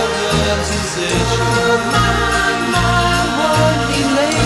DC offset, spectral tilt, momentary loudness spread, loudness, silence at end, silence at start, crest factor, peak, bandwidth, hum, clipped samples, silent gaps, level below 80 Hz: under 0.1%; -4 dB/octave; 3 LU; -15 LUFS; 0 s; 0 s; 14 dB; -2 dBFS; 14.5 kHz; none; under 0.1%; none; -28 dBFS